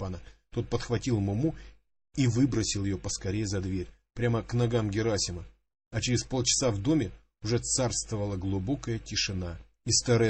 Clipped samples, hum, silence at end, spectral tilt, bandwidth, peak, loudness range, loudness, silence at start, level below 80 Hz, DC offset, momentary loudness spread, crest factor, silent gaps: under 0.1%; none; 0 s; -4.5 dB/octave; 8.8 kHz; -12 dBFS; 2 LU; -30 LUFS; 0 s; -48 dBFS; under 0.1%; 12 LU; 18 dB; 5.87-5.91 s